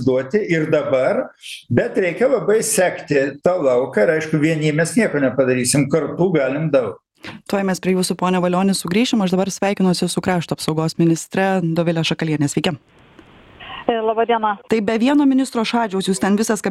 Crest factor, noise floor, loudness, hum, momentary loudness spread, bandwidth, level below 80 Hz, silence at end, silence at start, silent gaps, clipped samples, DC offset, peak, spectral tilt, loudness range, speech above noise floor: 18 dB; -46 dBFS; -18 LUFS; none; 5 LU; 14.5 kHz; -54 dBFS; 0 s; 0 s; none; under 0.1%; under 0.1%; 0 dBFS; -5 dB/octave; 3 LU; 28 dB